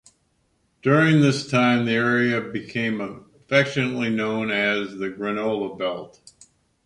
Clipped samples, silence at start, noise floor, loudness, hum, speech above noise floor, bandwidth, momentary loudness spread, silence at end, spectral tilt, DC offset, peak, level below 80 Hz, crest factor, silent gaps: under 0.1%; 0.85 s; -67 dBFS; -22 LUFS; none; 45 dB; 11 kHz; 11 LU; 0.8 s; -6 dB/octave; under 0.1%; -4 dBFS; -62 dBFS; 20 dB; none